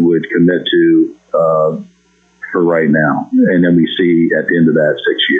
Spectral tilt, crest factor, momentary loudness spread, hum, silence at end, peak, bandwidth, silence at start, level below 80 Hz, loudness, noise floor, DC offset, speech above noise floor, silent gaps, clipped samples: -8.5 dB/octave; 8 dB; 5 LU; none; 0 s; -2 dBFS; 3.9 kHz; 0 s; -58 dBFS; -12 LUFS; -53 dBFS; under 0.1%; 42 dB; none; under 0.1%